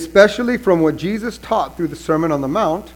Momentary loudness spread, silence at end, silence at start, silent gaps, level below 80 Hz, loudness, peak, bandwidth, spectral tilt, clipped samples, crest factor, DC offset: 10 LU; 0.05 s; 0 s; none; -44 dBFS; -17 LUFS; 0 dBFS; 18 kHz; -6 dB/octave; under 0.1%; 16 dB; under 0.1%